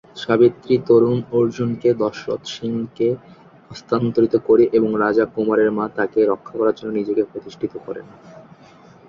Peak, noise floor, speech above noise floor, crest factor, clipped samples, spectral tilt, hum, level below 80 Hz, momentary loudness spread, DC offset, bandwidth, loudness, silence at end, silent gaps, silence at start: -2 dBFS; -46 dBFS; 28 dB; 16 dB; under 0.1%; -7.5 dB/octave; none; -58 dBFS; 13 LU; under 0.1%; 7.2 kHz; -19 LUFS; 0.65 s; none; 0.15 s